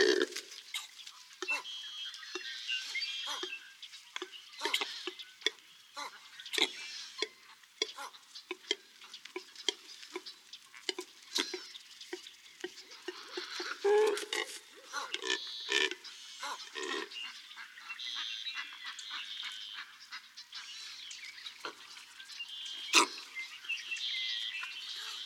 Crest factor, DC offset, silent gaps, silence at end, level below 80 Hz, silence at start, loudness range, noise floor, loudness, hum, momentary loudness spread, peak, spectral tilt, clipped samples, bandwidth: 30 dB; under 0.1%; none; 0 s; under -90 dBFS; 0 s; 8 LU; -59 dBFS; -37 LUFS; none; 16 LU; -8 dBFS; 1 dB/octave; under 0.1%; 19 kHz